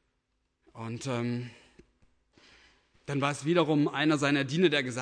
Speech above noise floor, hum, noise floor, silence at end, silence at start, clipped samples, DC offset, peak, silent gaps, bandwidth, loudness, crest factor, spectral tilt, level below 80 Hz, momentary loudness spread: 50 dB; none; -78 dBFS; 0 s; 0.75 s; under 0.1%; under 0.1%; -12 dBFS; none; 10.5 kHz; -28 LUFS; 18 dB; -5.5 dB/octave; -70 dBFS; 15 LU